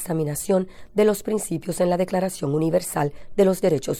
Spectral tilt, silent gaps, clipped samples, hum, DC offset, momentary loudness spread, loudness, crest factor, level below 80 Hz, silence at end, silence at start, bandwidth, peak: -6 dB/octave; none; under 0.1%; none; under 0.1%; 6 LU; -23 LUFS; 16 dB; -50 dBFS; 0 s; 0 s; 17 kHz; -6 dBFS